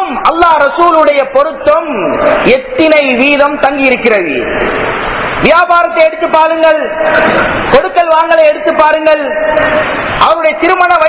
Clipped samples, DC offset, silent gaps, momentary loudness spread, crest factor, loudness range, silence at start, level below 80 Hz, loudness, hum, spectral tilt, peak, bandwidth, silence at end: 4%; under 0.1%; none; 5 LU; 8 dB; 1 LU; 0 s; -36 dBFS; -8 LUFS; none; -8.5 dB/octave; 0 dBFS; 4 kHz; 0 s